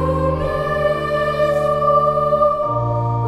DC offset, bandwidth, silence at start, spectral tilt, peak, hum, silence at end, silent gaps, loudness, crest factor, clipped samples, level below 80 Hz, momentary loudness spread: under 0.1%; 13 kHz; 0 s; -7.5 dB/octave; -4 dBFS; none; 0 s; none; -17 LUFS; 14 dB; under 0.1%; -34 dBFS; 4 LU